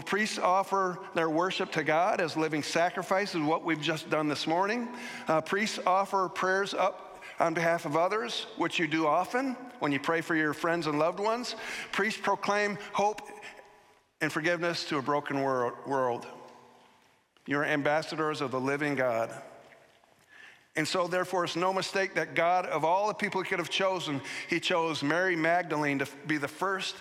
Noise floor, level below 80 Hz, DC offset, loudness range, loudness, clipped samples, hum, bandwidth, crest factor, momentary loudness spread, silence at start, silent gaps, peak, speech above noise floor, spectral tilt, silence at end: -65 dBFS; -78 dBFS; under 0.1%; 3 LU; -29 LUFS; under 0.1%; none; 16 kHz; 18 dB; 6 LU; 0 s; none; -12 dBFS; 35 dB; -4.5 dB/octave; 0 s